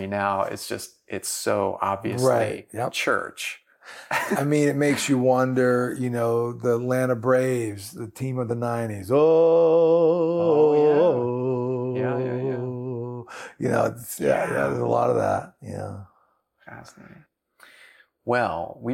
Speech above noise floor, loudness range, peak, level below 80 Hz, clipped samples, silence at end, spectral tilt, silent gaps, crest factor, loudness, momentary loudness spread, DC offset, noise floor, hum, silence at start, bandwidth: 43 dB; 8 LU; -10 dBFS; -66 dBFS; under 0.1%; 0 s; -5.5 dB/octave; none; 14 dB; -23 LUFS; 16 LU; under 0.1%; -65 dBFS; none; 0 s; 16.5 kHz